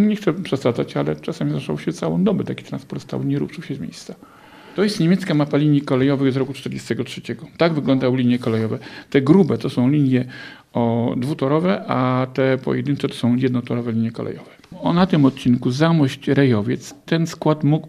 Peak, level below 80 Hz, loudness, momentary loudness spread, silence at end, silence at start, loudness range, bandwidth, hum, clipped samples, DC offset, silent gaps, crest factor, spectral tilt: -2 dBFS; -56 dBFS; -20 LUFS; 13 LU; 0 s; 0 s; 5 LU; 14 kHz; none; under 0.1%; under 0.1%; none; 18 dB; -7.5 dB/octave